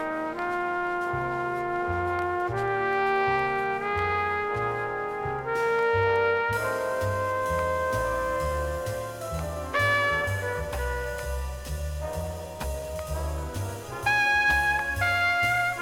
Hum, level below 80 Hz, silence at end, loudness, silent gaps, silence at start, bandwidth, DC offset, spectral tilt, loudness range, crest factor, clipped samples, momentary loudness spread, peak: none; -40 dBFS; 0 s; -27 LUFS; none; 0 s; 17.5 kHz; under 0.1%; -5 dB/octave; 4 LU; 16 dB; under 0.1%; 11 LU; -12 dBFS